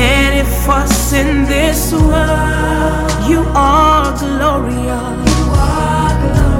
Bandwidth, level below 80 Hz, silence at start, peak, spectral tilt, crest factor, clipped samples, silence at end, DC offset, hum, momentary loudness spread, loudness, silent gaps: 17.5 kHz; -16 dBFS; 0 s; 0 dBFS; -5 dB/octave; 12 dB; under 0.1%; 0 s; under 0.1%; none; 5 LU; -13 LUFS; none